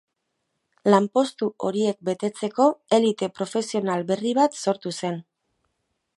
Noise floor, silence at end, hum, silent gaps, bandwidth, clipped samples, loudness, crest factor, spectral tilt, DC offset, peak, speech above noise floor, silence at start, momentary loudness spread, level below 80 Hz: -77 dBFS; 0.95 s; none; none; 11.5 kHz; under 0.1%; -23 LUFS; 22 dB; -5.5 dB/octave; under 0.1%; -2 dBFS; 54 dB; 0.85 s; 8 LU; -74 dBFS